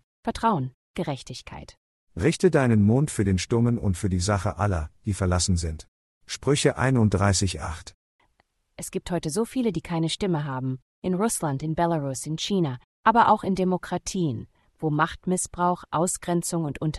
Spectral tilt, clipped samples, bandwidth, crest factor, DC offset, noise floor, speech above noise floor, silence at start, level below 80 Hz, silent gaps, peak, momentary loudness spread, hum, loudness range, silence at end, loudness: -5.5 dB/octave; under 0.1%; 12.5 kHz; 20 dB; under 0.1%; -69 dBFS; 45 dB; 0.25 s; -48 dBFS; 0.74-0.94 s, 1.77-2.07 s, 5.88-6.21 s, 7.94-8.19 s, 10.82-11.02 s, 12.84-13.03 s; -6 dBFS; 13 LU; none; 4 LU; 0 s; -25 LUFS